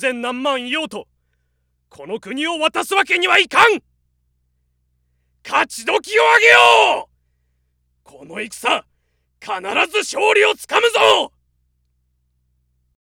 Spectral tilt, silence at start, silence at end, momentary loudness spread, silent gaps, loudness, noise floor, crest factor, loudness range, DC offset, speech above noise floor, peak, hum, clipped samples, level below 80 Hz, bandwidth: -1 dB/octave; 0 s; 1.75 s; 18 LU; none; -15 LUFS; -67 dBFS; 18 dB; 6 LU; under 0.1%; 51 dB; 0 dBFS; none; under 0.1%; -62 dBFS; 17.5 kHz